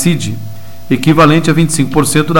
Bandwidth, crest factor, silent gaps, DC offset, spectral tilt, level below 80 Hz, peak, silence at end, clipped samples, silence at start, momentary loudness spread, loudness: 17 kHz; 12 dB; none; 7%; -5.5 dB/octave; -34 dBFS; 0 dBFS; 0 s; under 0.1%; 0 s; 15 LU; -11 LUFS